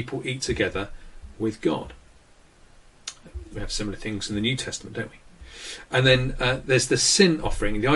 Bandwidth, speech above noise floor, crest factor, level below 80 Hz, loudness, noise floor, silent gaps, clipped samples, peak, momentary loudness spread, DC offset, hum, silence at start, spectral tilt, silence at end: 11.5 kHz; 30 dB; 22 dB; -38 dBFS; -24 LUFS; -54 dBFS; none; under 0.1%; -4 dBFS; 20 LU; under 0.1%; none; 0 s; -3.5 dB/octave; 0 s